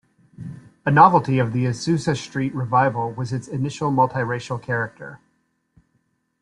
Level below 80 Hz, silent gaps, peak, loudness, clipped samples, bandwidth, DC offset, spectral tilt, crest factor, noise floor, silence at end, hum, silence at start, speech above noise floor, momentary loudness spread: -58 dBFS; none; -2 dBFS; -21 LUFS; under 0.1%; 11 kHz; under 0.1%; -6.5 dB/octave; 20 dB; -69 dBFS; 1.25 s; none; 0.4 s; 49 dB; 23 LU